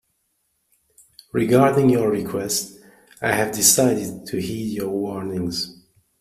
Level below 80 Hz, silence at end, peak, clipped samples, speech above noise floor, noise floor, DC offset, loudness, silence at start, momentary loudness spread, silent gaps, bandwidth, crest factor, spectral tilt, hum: -56 dBFS; 0.5 s; -2 dBFS; under 0.1%; 50 dB; -70 dBFS; under 0.1%; -20 LUFS; 1.35 s; 13 LU; none; 15.5 kHz; 20 dB; -4 dB/octave; none